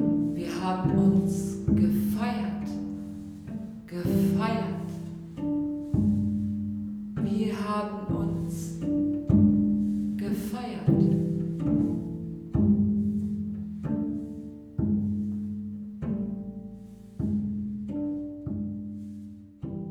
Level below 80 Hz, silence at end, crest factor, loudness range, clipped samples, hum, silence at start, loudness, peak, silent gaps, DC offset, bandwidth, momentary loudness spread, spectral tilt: -48 dBFS; 0 s; 16 dB; 7 LU; under 0.1%; none; 0 s; -28 LUFS; -10 dBFS; none; under 0.1%; 15.5 kHz; 15 LU; -8.5 dB/octave